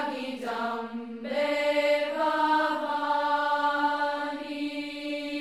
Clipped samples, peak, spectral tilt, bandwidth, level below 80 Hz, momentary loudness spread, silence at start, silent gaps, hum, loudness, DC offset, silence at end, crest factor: under 0.1%; -14 dBFS; -3.5 dB/octave; 14 kHz; -70 dBFS; 9 LU; 0 s; none; none; -28 LUFS; under 0.1%; 0 s; 14 dB